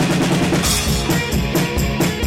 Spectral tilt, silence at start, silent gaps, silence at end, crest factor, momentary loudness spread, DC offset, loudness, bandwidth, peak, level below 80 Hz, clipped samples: -4.5 dB/octave; 0 s; none; 0 s; 10 dB; 3 LU; under 0.1%; -17 LUFS; 16.5 kHz; -6 dBFS; -28 dBFS; under 0.1%